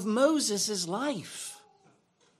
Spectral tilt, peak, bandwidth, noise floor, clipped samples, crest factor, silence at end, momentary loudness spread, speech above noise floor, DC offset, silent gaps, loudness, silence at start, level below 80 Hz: -3 dB/octave; -12 dBFS; 15 kHz; -67 dBFS; under 0.1%; 20 dB; 0.8 s; 15 LU; 38 dB; under 0.1%; none; -29 LUFS; 0 s; -84 dBFS